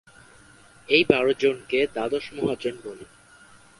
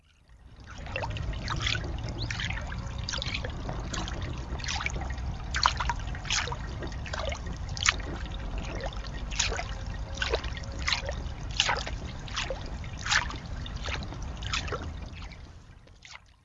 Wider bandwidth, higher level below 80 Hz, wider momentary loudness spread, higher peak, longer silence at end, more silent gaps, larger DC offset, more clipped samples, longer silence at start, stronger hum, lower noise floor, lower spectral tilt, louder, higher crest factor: first, 11.5 kHz vs 8 kHz; second, -60 dBFS vs -38 dBFS; first, 18 LU vs 12 LU; about the same, 0 dBFS vs 0 dBFS; first, 0.75 s vs 0.2 s; neither; neither; neither; first, 0.9 s vs 0.3 s; neither; about the same, -52 dBFS vs -55 dBFS; first, -5 dB/octave vs -3 dB/octave; first, -23 LUFS vs -32 LUFS; second, 26 dB vs 32 dB